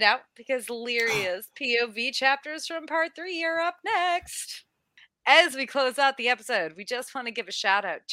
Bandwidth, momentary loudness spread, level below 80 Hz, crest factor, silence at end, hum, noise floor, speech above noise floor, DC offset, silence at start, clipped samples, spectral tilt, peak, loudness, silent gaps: 16 kHz; 11 LU; -70 dBFS; 24 dB; 0 s; none; -60 dBFS; 34 dB; under 0.1%; 0 s; under 0.1%; -1.5 dB/octave; -4 dBFS; -26 LUFS; none